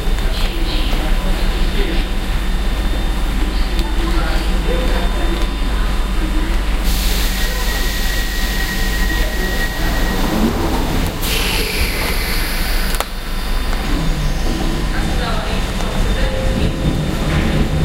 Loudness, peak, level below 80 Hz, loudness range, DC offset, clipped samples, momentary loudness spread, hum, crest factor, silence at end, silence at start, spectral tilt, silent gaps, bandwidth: -19 LUFS; 0 dBFS; -18 dBFS; 2 LU; under 0.1%; under 0.1%; 4 LU; none; 16 dB; 0 s; 0 s; -4.5 dB/octave; none; 16 kHz